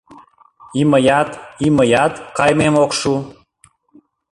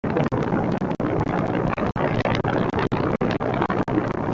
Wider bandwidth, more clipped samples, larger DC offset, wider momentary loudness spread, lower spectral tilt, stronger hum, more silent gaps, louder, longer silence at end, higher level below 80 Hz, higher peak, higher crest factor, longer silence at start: first, 11.5 kHz vs 7.6 kHz; neither; neither; first, 10 LU vs 2 LU; second, -5.5 dB/octave vs -8 dB/octave; neither; neither; first, -15 LUFS vs -23 LUFS; first, 1 s vs 0 s; second, -48 dBFS vs -42 dBFS; first, -2 dBFS vs -6 dBFS; about the same, 16 dB vs 16 dB; first, 0.7 s vs 0.05 s